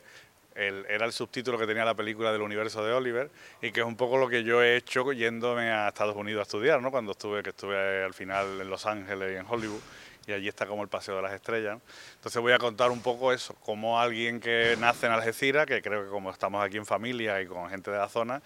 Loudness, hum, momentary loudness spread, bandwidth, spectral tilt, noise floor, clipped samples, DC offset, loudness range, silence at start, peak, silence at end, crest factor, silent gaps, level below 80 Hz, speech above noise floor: -29 LUFS; none; 10 LU; 16.5 kHz; -4 dB/octave; -55 dBFS; under 0.1%; under 0.1%; 7 LU; 0.1 s; -6 dBFS; 0.05 s; 24 dB; none; -72 dBFS; 26 dB